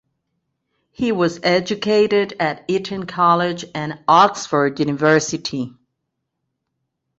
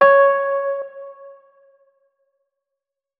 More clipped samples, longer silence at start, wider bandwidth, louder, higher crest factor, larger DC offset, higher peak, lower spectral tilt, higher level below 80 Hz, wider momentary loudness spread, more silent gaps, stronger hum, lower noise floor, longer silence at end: neither; first, 1 s vs 0 s; first, 8 kHz vs 4.7 kHz; about the same, -18 LUFS vs -17 LUFS; about the same, 18 dB vs 18 dB; neither; about the same, -2 dBFS vs -2 dBFS; second, -4.5 dB/octave vs -6 dB/octave; first, -60 dBFS vs -72 dBFS; second, 11 LU vs 25 LU; neither; neither; second, -77 dBFS vs -84 dBFS; second, 1.5 s vs 1.9 s